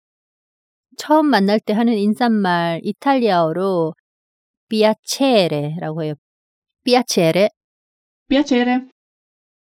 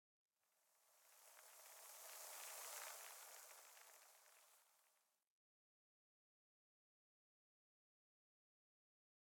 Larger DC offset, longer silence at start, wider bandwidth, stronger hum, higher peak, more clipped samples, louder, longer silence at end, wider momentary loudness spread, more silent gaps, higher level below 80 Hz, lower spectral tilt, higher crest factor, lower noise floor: neither; first, 1 s vs 0.5 s; second, 16.5 kHz vs 19 kHz; neither; first, -2 dBFS vs -40 dBFS; neither; first, -17 LUFS vs -57 LUFS; second, 0.9 s vs 4.35 s; second, 10 LU vs 15 LU; first, 3.99-4.67 s, 4.99-5.03 s, 6.18-6.62 s, 7.57-8.26 s vs none; first, -58 dBFS vs under -90 dBFS; first, -5 dB/octave vs 4 dB/octave; second, 16 dB vs 24 dB; first, under -90 dBFS vs -84 dBFS